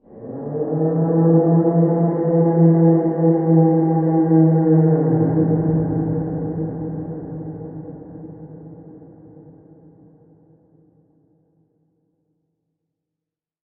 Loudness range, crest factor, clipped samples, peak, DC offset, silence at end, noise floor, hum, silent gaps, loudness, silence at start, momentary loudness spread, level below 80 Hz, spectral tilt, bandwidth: 18 LU; 16 dB; under 0.1%; -4 dBFS; under 0.1%; 4.65 s; -86 dBFS; none; none; -17 LUFS; 0.15 s; 20 LU; -52 dBFS; -15 dB/octave; 2.1 kHz